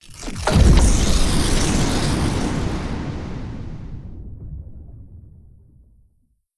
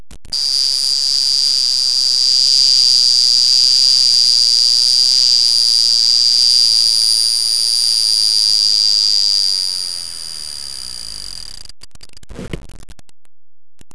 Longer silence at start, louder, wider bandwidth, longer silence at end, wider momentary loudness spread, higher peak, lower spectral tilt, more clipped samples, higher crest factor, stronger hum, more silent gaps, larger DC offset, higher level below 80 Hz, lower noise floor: about the same, 0.05 s vs 0 s; second, -20 LUFS vs -10 LUFS; about the same, 12 kHz vs 11 kHz; first, 1.3 s vs 0 s; first, 22 LU vs 16 LU; about the same, -2 dBFS vs 0 dBFS; first, -5 dB/octave vs 1.5 dB/octave; neither; about the same, 18 dB vs 14 dB; neither; neither; second, under 0.1% vs 2%; first, -24 dBFS vs -46 dBFS; second, -63 dBFS vs under -90 dBFS